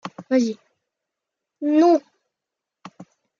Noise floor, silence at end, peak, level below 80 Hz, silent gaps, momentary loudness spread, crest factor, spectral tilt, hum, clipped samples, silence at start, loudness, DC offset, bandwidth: -85 dBFS; 0.35 s; -6 dBFS; -80 dBFS; none; 12 LU; 16 dB; -5.5 dB/octave; none; under 0.1%; 0.05 s; -20 LUFS; under 0.1%; 7.4 kHz